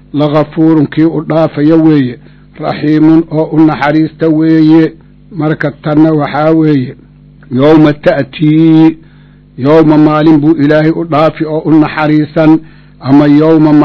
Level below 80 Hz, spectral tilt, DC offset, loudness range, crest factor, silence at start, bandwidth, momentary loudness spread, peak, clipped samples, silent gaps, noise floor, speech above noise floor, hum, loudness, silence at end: -40 dBFS; -9.5 dB/octave; 0.3%; 2 LU; 8 dB; 0.15 s; 6 kHz; 9 LU; 0 dBFS; 6%; none; -38 dBFS; 31 dB; none; -8 LUFS; 0 s